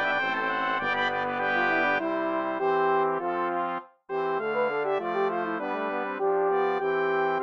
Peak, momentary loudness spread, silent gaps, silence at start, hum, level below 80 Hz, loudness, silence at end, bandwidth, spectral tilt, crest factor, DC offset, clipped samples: -14 dBFS; 6 LU; none; 0 s; none; -80 dBFS; -27 LUFS; 0 s; 6.6 kHz; -6 dB/octave; 14 dB; under 0.1%; under 0.1%